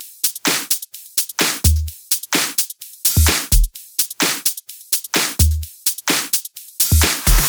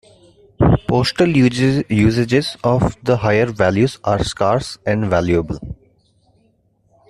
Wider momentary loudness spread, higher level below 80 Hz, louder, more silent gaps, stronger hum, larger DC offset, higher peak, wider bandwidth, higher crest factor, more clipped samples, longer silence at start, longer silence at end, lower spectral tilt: about the same, 6 LU vs 6 LU; first, -24 dBFS vs -36 dBFS; about the same, -17 LUFS vs -17 LUFS; neither; neither; neither; about the same, 0 dBFS vs -2 dBFS; first, over 20 kHz vs 12.5 kHz; about the same, 18 dB vs 14 dB; neither; second, 0 s vs 0.6 s; second, 0 s vs 1.35 s; second, -2.5 dB/octave vs -6.5 dB/octave